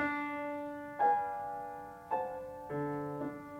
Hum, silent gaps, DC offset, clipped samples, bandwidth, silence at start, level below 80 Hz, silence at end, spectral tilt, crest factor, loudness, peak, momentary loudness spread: none; none; under 0.1%; under 0.1%; 16.5 kHz; 0 s; -70 dBFS; 0 s; -7.5 dB/octave; 16 dB; -37 LUFS; -20 dBFS; 12 LU